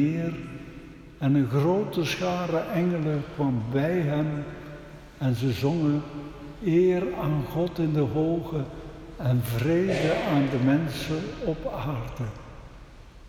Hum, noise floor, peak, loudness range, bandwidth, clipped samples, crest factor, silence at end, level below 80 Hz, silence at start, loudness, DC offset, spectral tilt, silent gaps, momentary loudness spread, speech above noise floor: none; -46 dBFS; -10 dBFS; 2 LU; 17 kHz; under 0.1%; 16 dB; 0 s; -48 dBFS; 0 s; -26 LUFS; under 0.1%; -7.5 dB/octave; none; 18 LU; 21 dB